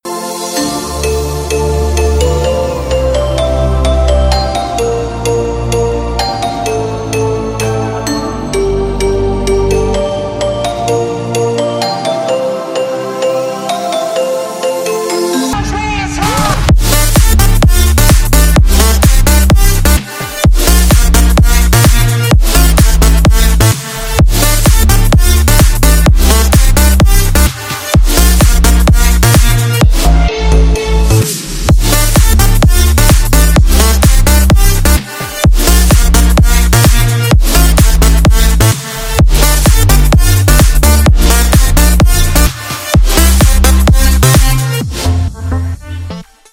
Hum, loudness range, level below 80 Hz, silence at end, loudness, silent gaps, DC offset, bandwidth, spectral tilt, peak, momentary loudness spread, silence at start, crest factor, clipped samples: none; 6 LU; -10 dBFS; 0.3 s; -10 LUFS; none; under 0.1%; over 20 kHz; -4.5 dB/octave; 0 dBFS; 7 LU; 0.05 s; 8 dB; 0.8%